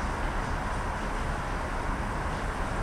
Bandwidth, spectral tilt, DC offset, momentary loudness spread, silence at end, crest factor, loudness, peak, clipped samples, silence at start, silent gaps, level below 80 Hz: 13 kHz; -5.5 dB/octave; under 0.1%; 1 LU; 0 s; 12 dB; -32 LUFS; -18 dBFS; under 0.1%; 0 s; none; -34 dBFS